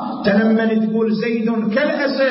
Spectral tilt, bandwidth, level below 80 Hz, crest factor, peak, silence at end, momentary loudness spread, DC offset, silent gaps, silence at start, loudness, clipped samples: -10.5 dB/octave; 5.8 kHz; -60 dBFS; 12 dB; -4 dBFS; 0 s; 4 LU; under 0.1%; none; 0 s; -17 LUFS; under 0.1%